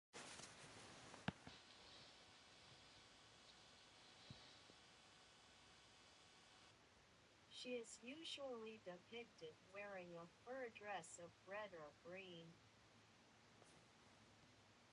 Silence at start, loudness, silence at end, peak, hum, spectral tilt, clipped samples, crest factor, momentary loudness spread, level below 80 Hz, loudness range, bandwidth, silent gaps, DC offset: 0.15 s; -58 LUFS; 0 s; -30 dBFS; none; -3.5 dB/octave; under 0.1%; 28 dB; 14 LU; -84 dBFS; 10 LU; 11 kHz; none; under 0.1%